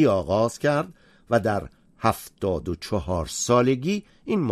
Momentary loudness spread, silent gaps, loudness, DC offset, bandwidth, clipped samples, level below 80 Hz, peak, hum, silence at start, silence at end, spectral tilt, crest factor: 9 LU; none; -25 LUFS; under 0.1%; 13.5 kHz; under 0.1%; -46 dBFS; -6 dBFS; none; 0 s; 0 s; -5.5 dB/octave; 18 dB